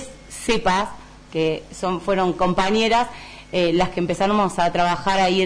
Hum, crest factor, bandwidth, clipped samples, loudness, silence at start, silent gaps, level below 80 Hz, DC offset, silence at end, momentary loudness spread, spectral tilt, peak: none; 12 dB; 11 kHz; under 0.1%; -21 LUFS; 0 s; none; -42 dBFS; under 0.1%; 0 s; 10 LU; -5 dB/octave; -8 dBFS